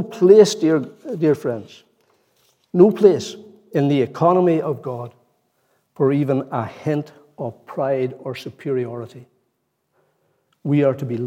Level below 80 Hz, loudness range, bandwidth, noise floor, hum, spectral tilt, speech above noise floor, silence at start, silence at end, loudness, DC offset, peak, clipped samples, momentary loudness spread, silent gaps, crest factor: -70 dBFS; 8 LU; 14.5 kHz; -71 dBFS; none; -7 dB/octave; 53 dB; 0 s; 0 s; -19 LUFS; under 0.1%; 0 dBFS; under 0.1%; 19 LU; none; 20 dB